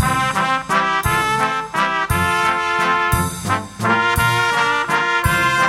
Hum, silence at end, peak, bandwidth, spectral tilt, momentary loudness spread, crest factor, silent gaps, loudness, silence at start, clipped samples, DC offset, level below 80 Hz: none; 0 s; -2 dBFS; 16 kHz; -3.5 dB/octave; 4 LU; 16 dB; none; -17 LUFS; 0 s; under 0.1%; under 0.1%; -34 dBFS